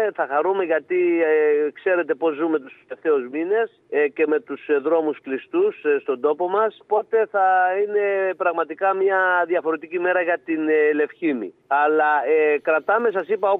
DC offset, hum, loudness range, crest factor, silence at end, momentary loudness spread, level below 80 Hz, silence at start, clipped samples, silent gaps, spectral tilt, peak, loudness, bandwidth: under 0.1%; none; 2 LU; 14 dB; 0 s; 6 LU; -82 dBFS; 0 s; under 0.1%; none; -8 dB/octave; -6 dBFS; -21 LUFS; 3.9 kHz